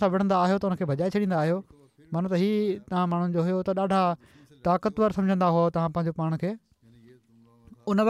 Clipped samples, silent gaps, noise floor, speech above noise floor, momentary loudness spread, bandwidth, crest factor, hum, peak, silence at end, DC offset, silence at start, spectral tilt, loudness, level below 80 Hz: under 0.1%; none; -58 dBFS; 33 dB; 9 LU; 11 kHz; 14 dB; none; -12 dBFS; 0 s; under 0.1%; 0 s; -8.5 dB/octave; -26 LUFS; -60 dBFS